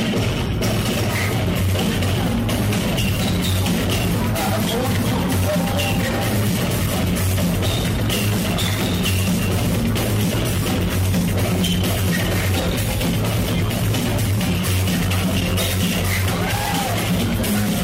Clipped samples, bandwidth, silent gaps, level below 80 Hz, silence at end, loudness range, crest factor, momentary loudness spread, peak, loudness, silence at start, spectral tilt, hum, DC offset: under 0.1%; 16.5 kHz; none; -32 dBFS; 0 s; 0 LU; 10 dB; 1 LU; -10 dBFS; -20 LUFS; 0 s; -5 dB/octave; none; under 0.1%